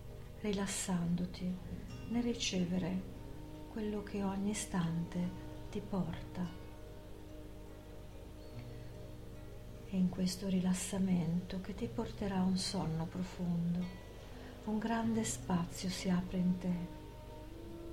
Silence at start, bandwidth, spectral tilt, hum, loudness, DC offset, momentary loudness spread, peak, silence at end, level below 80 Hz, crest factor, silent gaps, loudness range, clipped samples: 0 s; 16 kHz; -5.5 dB/octave; 50 Hz at -55 dBFS; -38 LUFS; under 0.1%; 17 LU; -22 dBFS; 0 s; -52 dBFS; 16 dB; none; 9 LU; under 0.1%